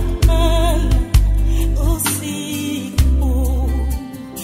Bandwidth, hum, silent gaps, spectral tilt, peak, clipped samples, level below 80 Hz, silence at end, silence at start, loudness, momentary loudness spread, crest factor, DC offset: 16 kHz; none; none; -5.5 dB/octave; -2 dBFS; under 0.1%; -16 dBFS; 0 s; 0 s; -18 LUFS; 7 LU; 14 dB; under 0.1%